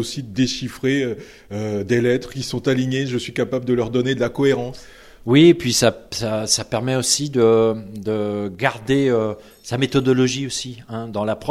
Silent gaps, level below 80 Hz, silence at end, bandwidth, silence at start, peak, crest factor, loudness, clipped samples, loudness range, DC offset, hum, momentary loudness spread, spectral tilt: none; -50 dBFS; 0 s; 15.5 kHz; 0 s; 0 dBFS; 18 dB; -20 LUFS; under 0.1%; 4 LU; under 0.1%; none; 12 LU; -4.5 dB/octave